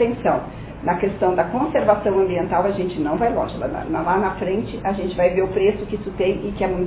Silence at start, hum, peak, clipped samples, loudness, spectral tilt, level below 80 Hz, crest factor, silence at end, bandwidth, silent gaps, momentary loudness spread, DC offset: 0 s; none; -2 dBFS; under 0.1%; -21 LUFS; -11 dB/octave; -40 dBFS; 18 dB; 0 s; 4 kHz; none; 7 LU; under 0.1%